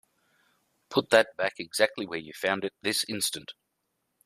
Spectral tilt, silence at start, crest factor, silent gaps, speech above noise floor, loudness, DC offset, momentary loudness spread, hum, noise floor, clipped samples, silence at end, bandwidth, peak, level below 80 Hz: -2.5 dB/octave; 0.9 s; 26 dB; none; 51 dB; -28 LUFS; under 0.1%; 13 LU; none; -79 dBFS; under 0.1%; 0.75 s; 15.5 kHz; -4 dBFS; -74 dBFS